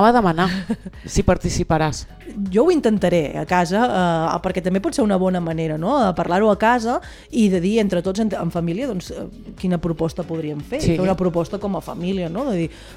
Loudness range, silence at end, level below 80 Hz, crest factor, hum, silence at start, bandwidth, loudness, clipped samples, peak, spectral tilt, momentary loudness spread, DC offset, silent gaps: 4 LU; 0 s; -38 dBFS; 20 dB; none; 0 s; 14.5 kHz; -20 LUFS; under 0.1%; 0 dBFS; -6.5 dB/octave; 10 LU; under 0.1%; none